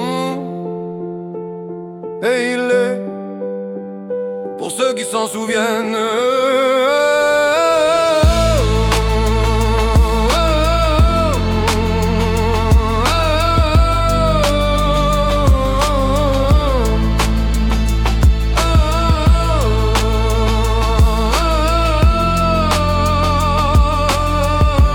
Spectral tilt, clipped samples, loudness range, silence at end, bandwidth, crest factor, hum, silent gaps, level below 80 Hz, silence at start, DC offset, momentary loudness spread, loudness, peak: -5.5 dB/octave; under 0.1%; 6 LU; 0 s; 17.5 kHz; 12 dB; none; none; -18 dBFS; 0 s; under 0.1%; 11 LU; -15 LUFS; -2 dBFS